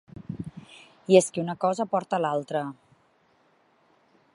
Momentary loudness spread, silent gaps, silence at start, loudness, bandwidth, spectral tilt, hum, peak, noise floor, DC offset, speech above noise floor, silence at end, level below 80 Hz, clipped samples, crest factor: 20 LU; none; 0.15 s; -26 LUFS; 11.5 kHz; -5 dB/octave; none; -4 dBFS; -64 dBFS; under 0.1%; 40 dB; 1.6 s; -64 dBFS; under 0.1%; 24 dB